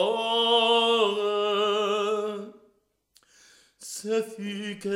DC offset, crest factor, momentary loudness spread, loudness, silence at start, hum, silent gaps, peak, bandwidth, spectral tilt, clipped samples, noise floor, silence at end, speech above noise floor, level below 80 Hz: under 0.1%; 16 dB; 17 LU; -25 LUFS; 0 s; none; none; -10 dBFS; 15.5 kHz; -3 dB/octave; under 0.1%; -68 dBFS; 0 s; 37 dB; -80 dBFS